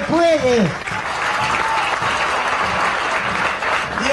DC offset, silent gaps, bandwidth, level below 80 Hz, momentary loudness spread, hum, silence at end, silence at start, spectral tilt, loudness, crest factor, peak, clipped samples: under 0.1%; none; 11.5 kHz; -44 dBFS; 5 LU; none; 0 s; 0 s; -4 dB/octave; -18 LUFS; 14 dB; -4 dBFS; under 0.1%